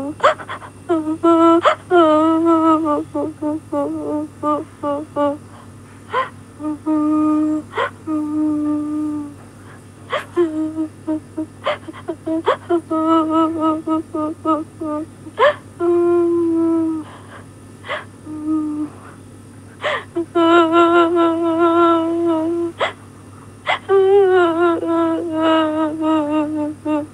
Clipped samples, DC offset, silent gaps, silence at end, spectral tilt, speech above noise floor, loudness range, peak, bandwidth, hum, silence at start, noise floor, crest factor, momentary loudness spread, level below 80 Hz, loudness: under 0.1%; under 0.1%; none; 0 s; -6 dB/octave; 26 dB; 8 LU; 0 dBFS; 10.5 kHz; none; 0 s; -39 dBFS; 18 dB; 15 LU; -58 dBFS; -18 LUFS